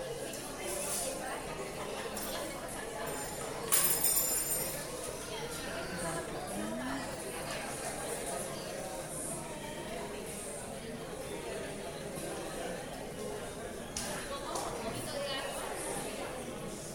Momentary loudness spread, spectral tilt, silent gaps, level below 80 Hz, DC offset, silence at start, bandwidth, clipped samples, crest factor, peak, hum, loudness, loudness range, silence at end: 11 LU; -2.5 dB/octave; none; -56 dBFS; under 0.1%; 0 s; 19.5 kHz; under 0.1%; 24 dB; -14 dBFS; none; -36 LUFS; 9 LU; 0 s